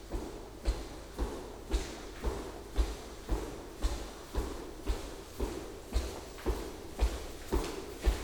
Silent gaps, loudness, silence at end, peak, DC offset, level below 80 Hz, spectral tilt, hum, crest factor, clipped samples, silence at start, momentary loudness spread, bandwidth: none; -40 LUFS; 0 s; -16 dBFS; under 0.1%; -38 dBFS; -5 dB/octave; none; 20 dB; under 0.1%; 0 s; 7 LU; 19.5 kHz